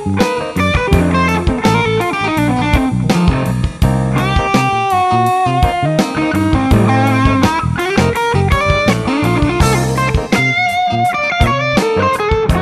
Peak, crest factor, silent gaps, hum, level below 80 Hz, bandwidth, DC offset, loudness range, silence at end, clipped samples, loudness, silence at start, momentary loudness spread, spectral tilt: 0 dBFS; 12 dB; none; none; -24 dBFS; 13.5 kHz; under 0.1%; 1 LU; 0 s; under 0.1%; -13 LUFS; 0 s; 3 LU; -6 dB/octave